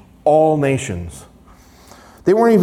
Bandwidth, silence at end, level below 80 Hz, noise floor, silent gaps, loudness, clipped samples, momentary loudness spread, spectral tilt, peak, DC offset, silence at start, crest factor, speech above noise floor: 14.5 kHz; 0 s; -48 dBFS; -45 dBFS; none; -16 LUFS; under 0.1%; 15 LU; -7 dB/octave; -4 dBFS; under 0.1%; 0.25 s; 14 dB; 31 dB